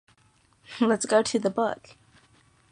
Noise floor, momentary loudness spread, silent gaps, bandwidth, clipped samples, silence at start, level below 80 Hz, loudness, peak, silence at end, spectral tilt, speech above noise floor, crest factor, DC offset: -63 dBFS; 15 LU; none; 10.5 kHz; under 0.1%; 0.7 s; -68 dBFS; -25 LUFS; -8 dBFS; 0.95 s; -4 dB/octave; 39 dB; 20 dB; under 0.1%